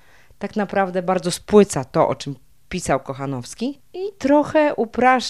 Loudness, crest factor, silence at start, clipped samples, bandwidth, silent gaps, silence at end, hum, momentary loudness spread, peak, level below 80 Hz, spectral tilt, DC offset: -20 LUFS; 18 dB; 0.4 s; under 0.1%; 13.5 kHz; none; 0 s; none; 15 LU; -2 dBFS; -50 dBFS; -5 dB/octave; 0.3%